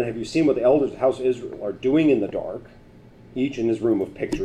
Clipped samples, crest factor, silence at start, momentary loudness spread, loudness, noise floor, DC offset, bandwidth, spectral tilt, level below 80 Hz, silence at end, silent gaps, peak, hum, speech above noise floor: under 0.1%; 14 dB; 0 s; 12 LU; -22 LUFS; -48 dBFS; under 0.1%; 10.5 kHz; -7 dB/octave; -50 dBFS; 0 s; none; -8 dBFS; none; 26 dB